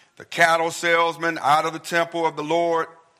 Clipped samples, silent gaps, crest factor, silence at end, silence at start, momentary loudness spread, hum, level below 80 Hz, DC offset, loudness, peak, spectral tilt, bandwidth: under 0.1%; none; 20 dB; 0.3 s; 0.2 s; 6 LU; none; -76 dBFS; under 0.1%; -21 LUFS; -2 dBFS; -3.5 dB/octave; 16 kHz